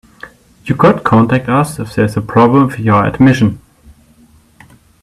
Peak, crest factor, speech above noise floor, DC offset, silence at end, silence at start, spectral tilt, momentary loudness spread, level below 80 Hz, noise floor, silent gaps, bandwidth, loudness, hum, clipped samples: 0 dBFS; 12 dB; 36 dB; under 0.1%; 1.45 s; 0.25 s; -7.5 dB/octave; 8 LU; -42 dBFS; -46 dBFS; none; 13.5 kHz; -11 LUFS; none; under 0.1%